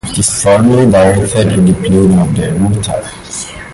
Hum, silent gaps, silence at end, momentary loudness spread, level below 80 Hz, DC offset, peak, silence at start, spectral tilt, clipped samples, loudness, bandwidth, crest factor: none; none; 0 s; 14 LU; -30 dBFS; under 0.1%; 0 dBFS; 0.05 s; -5.5 dB/octave; under 0.1%; -10 LUFS; 11.5 kHz; 10 dB